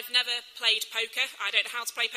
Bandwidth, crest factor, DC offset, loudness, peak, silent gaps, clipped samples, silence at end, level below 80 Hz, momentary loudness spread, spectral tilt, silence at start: 15.5 kHz; 22 dB; under 0.1%; -27 LUFS; -8 dBFS; none; under 0.1%; 0 s; -86 dBFS; 5 LU; 3.5 dB/octave; 0 s